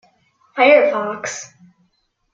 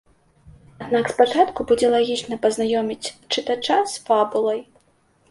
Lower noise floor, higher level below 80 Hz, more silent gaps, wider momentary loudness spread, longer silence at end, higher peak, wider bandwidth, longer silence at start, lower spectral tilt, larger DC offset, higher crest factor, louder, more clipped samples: first, -66 dBFS vs -61 dBFS; second, -72 dBFS vs -56 dBFS; neither; first, 19 LU vs 8 LU; first, 0.9 s vs 0.7 s; about the same, -2 dBFS vs -2 dBFS; second, 7.6 kHz vs 11.5 kHz; second, 0.55 s vs 0.8 s; about the same, -2.5 dB/octave vs -3.5 dB/octave; neither; about the same, 18 dB vs 20 dB; first, -15 LUFS vs -21 LUFS; neither